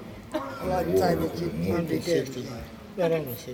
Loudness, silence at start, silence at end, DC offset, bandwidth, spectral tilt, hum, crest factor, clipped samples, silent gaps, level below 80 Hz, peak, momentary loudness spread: -28 LUFS; 0 s; 0 s; under 0.1%; over 20 kHz; -6 dB/octave; none; 16 dB; under 0.1%; none; -48 dBFS; -10 dBFS; 12 LU